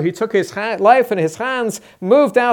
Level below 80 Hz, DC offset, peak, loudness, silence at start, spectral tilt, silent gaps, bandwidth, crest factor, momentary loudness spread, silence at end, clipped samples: -66 dBFS; under 0.1%; 0 dBFS; -16 LUFS; 0 s; -5 dB/octave; none; 19 kHz; 16 dB; 9 LU; 0 s; under 0.1%